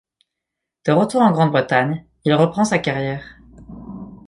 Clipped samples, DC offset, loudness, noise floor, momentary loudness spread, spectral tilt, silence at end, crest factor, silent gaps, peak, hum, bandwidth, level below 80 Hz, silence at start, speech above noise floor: under 0.1%; under 0.1%; -18 LUFS; -82 dBFS; 20 LU; -6.5 dB/octave; 0.1 s; 18 dB; none; -2 dBFS; none; 11.5 kHz; -52 dBFS; 0.85 s; 65 dB